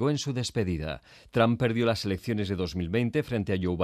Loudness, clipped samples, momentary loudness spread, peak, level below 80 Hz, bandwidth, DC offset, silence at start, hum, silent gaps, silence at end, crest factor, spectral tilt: -28 LUFS; under 0.1%; 7 LU; -10 dBFS; -52 dBFS; 14.5 kHz; under 0.1%; 0 s; none; none; 0 s; 18 dB; -6 dB/octave